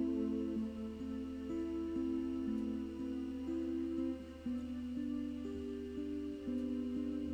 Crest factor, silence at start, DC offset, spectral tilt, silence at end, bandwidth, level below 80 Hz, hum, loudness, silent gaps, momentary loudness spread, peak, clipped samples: 14 dB; 0 s; under 0.1%; -7.5 dB/octave; 0 s; 9 kHz; -58 dBFS; none; -41 LUFS; none; 5 LU; -26 dBFS; under 0.1%